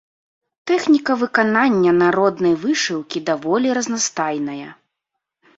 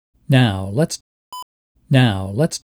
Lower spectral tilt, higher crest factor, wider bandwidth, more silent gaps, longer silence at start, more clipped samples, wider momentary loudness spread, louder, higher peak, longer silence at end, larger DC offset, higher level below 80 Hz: second, -4 dB/octave vs -6 dB/octave; about the same, 16 dB vs 16 dB; second, 8 kHz vs 15.5 kHz; second, none vs 1.01-1.32 s, 1.42-1.75 s; first, 0.65 s vs 0.3 s; neither; second, 10 LU vs 20 LU; about the same, -18 LUFS vs -18 LUFS; about the same, -2 dBFS vs -4 dBFS; first, 0.85 s vs 0.2 s; neither; about the same, -62 dBFS vs -58 dBFS